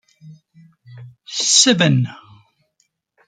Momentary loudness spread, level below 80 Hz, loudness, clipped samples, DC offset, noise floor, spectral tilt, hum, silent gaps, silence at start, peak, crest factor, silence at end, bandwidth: 16 LU; -64 dBFS; -14 LUFS; under 0.1%; under 0.1%; -68 dBFS; -3 dB/octave; none; none; 0.25 s; 0 dBFS; 20 dB; 1.15 s; 10 kHz